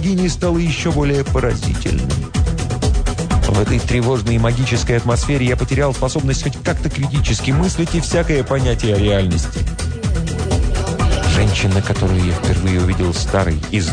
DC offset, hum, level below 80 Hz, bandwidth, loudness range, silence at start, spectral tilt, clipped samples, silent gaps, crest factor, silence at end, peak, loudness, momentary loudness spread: under 0.1%; none; -22 dBFS; 10 kHz; 1 LU; 0 s; -5.5 dB/octave; under 0.1%; none; 12 dB; 0 s; -4 dBFS; -17 LUFS; 4 LU